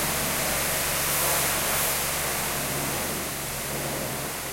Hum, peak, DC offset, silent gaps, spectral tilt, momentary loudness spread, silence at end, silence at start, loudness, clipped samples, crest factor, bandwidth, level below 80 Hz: none; -12 dBFS; under 0.1%; none; -2 dB/octave; 7 LU; 0 s; 0 s; -25 LUFS; under 0.1%; 16 dB; 16.5 kHz; -44 dBFS